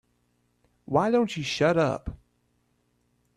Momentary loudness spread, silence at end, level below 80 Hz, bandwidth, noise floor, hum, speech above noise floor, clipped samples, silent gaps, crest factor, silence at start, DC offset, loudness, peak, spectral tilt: 10 LU; 1.2 s; -52 dBFS; 12.5 kHz; -71 dBFS; 60 Hz at -50 dBFS; 46 dB; under 0.1%; none; 20 dB; 0.9 s; under 0.1%; -25 LUFS; -8 dBFS; -5.5 dB/octave